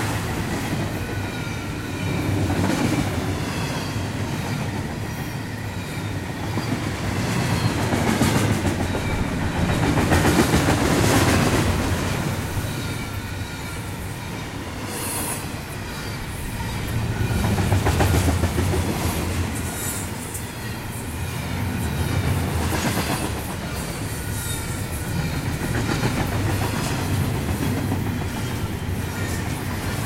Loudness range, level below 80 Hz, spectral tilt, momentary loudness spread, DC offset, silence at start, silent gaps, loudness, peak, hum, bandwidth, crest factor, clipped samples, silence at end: 8 LU; -34 dBFS; -5 dB/octave; 10 LU; under 0.1%; 0 s; none; -24 LUFS; -6 dBFS; none; 16 kHz; 18 dB; under 0.1%; 0 s